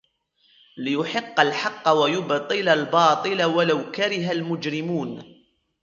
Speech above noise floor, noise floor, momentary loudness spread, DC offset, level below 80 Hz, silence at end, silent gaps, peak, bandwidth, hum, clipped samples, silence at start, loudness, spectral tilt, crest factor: 42 dB; -64 dBFS; 9 LU; under 0.1%; -70 dBFS; 0.6 s; none; -4 dBFS; 7.6 kHz; none; under 0.1%; 0.75 s; -22 LUFS; -5 dB/octave; 20 dB